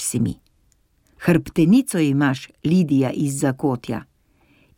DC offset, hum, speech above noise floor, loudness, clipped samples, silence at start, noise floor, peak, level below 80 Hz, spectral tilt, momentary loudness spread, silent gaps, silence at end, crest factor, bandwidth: under 0.1%; none; 42 dB; -20 LUFS; under 0.1%; 0 s; -61 dBFS; -4 dBFS; -52 dBFS; -6 dB/octave; 11 LU; none; 0.75 s; 18 dB; 17 kHz